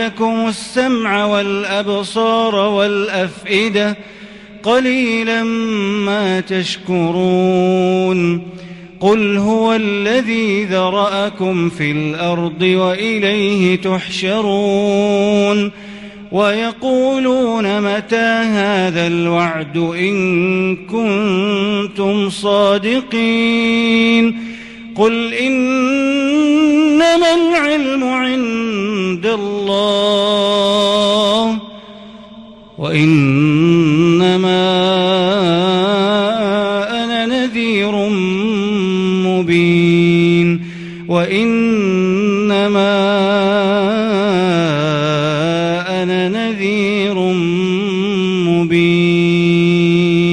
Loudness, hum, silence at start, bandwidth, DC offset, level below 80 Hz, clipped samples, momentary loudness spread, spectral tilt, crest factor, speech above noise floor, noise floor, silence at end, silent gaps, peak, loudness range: -14 LUFS; none; 0 s; 11 kHz; under 0.1%; -52 dBFS; under 0.1%; 6 LU; -6 dB/octave; 14 dB; 23 dB; -37 dBFS; 0 s; none; 0 dBFS; 3 LU